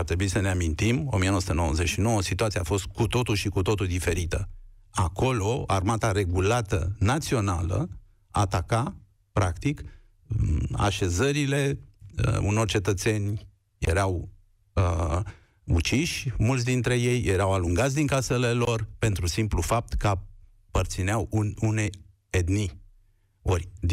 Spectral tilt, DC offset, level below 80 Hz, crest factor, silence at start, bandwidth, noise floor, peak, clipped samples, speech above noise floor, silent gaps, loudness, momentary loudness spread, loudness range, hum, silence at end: -5.5 dB/octave; under 0.1%; -38 dBFS; 14 dB; 0 s; 15.5 kHz; -61 dBFS; -12 dBFS; under 0.1%; 36 dB; none; -26 LUFS; 8 LU; 3 LU; none; 0 s